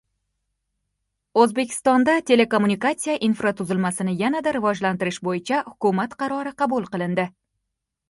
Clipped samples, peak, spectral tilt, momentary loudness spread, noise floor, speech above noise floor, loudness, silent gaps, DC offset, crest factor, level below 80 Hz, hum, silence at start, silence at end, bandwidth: under 0.1%; -4 dBFS; -5 dB/octave; 7 LU; -81 dBFS; 59 dB; -22 LUFS; none; under 0.1%; 20 dB; -64 dBFS; none; 1.35 s; 0.8 s; 11.5 kHz